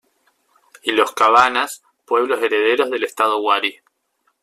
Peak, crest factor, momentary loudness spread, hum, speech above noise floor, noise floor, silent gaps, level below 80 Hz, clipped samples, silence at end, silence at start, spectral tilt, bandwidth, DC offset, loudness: 0 dBFS; 18 dB; 11 LU; none; 50 dB; -67 dBFS; none; -64 dBFS; under 0.1%; 0.7 s; 0.85 s; -2 dB/octave; 14.5 kHz; under 0.1%; -17 LUFS